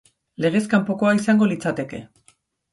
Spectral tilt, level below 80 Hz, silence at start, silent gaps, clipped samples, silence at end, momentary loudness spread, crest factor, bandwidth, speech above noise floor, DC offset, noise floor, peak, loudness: -6.5 dB/octave; -60 dBFS; 0.4 s; none; under 0.1%; 0.65 s; 12 LU; 16 dB; 11.5 kHz; 40 dB; under 0.1%; -60 dBFS; -6 dBFS; -20 LUFS